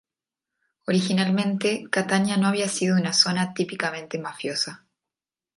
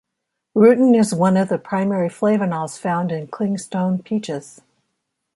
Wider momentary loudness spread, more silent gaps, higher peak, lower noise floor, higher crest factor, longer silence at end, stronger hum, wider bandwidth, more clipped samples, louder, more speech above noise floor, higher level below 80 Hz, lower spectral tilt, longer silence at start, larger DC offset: about the same, 10 LU vs 10 LU; neither; about the same, -4 dBFS vs -2 dBFS; first, under -90 dBFS vs -79 dBFS; first, 22 dB vs 16 dB; about the same, 0.8 s vs 0.9 s; neither; about the same, 11.5 kHz vs 11.5 kHz; neither; second, -23 LUFS vs -19 LUFS; first, over 66 dB vs 61 dB; second, -70 dBFS vs -64 dBFS; second, -4 dB/octave vs -7 dB/octave; first, 0.9 s vs 0.55 s; neither